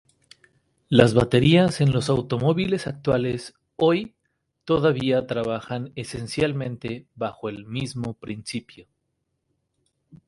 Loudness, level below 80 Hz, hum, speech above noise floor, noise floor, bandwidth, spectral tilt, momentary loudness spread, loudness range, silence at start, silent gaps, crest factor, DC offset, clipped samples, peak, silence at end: -23 LUFS; -50 dBFS; none; 54 dB; -76 dBFS; 11.5 kHz; -6.5 dB/octave; 16 LU; 11 LU; 0.9 s; none; 24 dB; under 0.1%; under 0.1%; 0 dBFS; 0.1 s